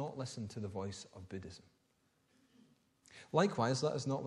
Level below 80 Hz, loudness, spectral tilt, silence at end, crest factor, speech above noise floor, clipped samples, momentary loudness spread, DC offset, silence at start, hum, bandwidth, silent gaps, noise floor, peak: -74 dBFS; -38 LUFS; -5.5 dB/octave; 0 s; 24 dB; 39 dB; under 0.1%; 19 LU; under 0.1%; 0 s; none; 11.5 kHz; none; -77 dBFS; -16 dBFS